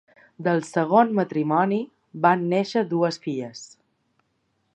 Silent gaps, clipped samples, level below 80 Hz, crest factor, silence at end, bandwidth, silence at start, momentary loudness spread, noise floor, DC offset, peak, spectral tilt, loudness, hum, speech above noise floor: none; under 0.1%; -76 dBFS; 20 dB; 1.1 s; 10.5 kHz; 0.4 s; 12 LU; -71 dBFS; under 0.1%; -4 dBFS; -6.5 dB/octave; -23 LUFS; none; 49 dB